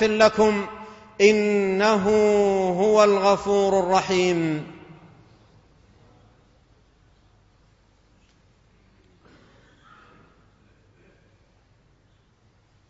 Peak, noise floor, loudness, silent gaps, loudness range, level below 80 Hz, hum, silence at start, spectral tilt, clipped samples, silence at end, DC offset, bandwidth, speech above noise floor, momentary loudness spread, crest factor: -4 dBFS; -60 dBFS; -20 LUFS; none; 10 LU; -56 dBFS; none; 0 s; -5 dB/octave; under 0.1%; 8.1 s; under 0.1%; 8 kHz; 41 dB; 12 LU; 20 dB